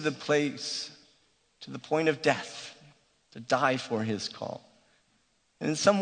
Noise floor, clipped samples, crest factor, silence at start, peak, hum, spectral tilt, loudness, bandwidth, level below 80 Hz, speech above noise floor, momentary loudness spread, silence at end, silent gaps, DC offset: -70 dBFS; under 0.1%; 24 dB; 0 s; -8 dBFS; none; -4 dB/octave; -29 LUFS; 9.4 kHz; -74 dBFS; 41 dB; 19 LU; 0 s; none; under 0.1%